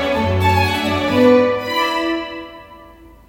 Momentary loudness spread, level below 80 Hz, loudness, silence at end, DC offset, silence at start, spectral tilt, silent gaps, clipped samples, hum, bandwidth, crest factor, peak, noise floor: 15 LU; -46 dBFS; -16 LUFS; 0.45 s; under 0.1%; 0 s; -6 dB/octave; none; under 0.1%; none; 16.5 kHz; 16 dB; 0 dBFS; -42 dBFS